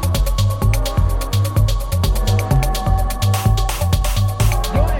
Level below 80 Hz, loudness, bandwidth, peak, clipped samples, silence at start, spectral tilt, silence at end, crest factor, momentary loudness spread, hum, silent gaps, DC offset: -20 dBFS; -18 LUFS; 17 kHz; -4 dBFS; under 0.1%; 0 s; -5.5 dB/octave; 0 s; 12 dB; 2 LU; none; none; under 0.1%